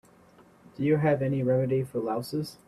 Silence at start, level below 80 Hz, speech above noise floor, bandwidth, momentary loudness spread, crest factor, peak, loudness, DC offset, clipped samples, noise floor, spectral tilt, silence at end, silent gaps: 0.8 s; -64 dBFS; 30 dB; 14.5 kHz; 7 LU; 16 dB; -12 dBFS; -27 LUFS; under 0.1%; under 0.1%; -57 dBFS; -8 dB/octave; 0.15 s; none